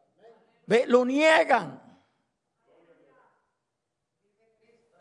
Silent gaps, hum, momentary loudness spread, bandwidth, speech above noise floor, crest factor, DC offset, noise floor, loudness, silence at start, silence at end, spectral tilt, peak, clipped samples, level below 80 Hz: none; none; 6 LU; 10.5 kHz; 61 dB; 22 dB; under 0.1%; -83 dBFS; -22 LUFS; 0.7 s; 3.25 s; -4 dB/octave; -6 dBFS; under 0.1%; -84 dBFS